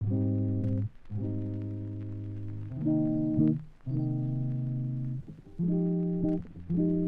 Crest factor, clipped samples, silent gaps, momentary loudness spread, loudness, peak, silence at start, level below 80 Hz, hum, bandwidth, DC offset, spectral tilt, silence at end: 16 dB; under 0.1%; none; 11 LU; -32 LUFS; -14 dBFS; 0 s; -52 dBFS; none; 3.2 kHz; under 0.1%; -13 dB/octave; 0 s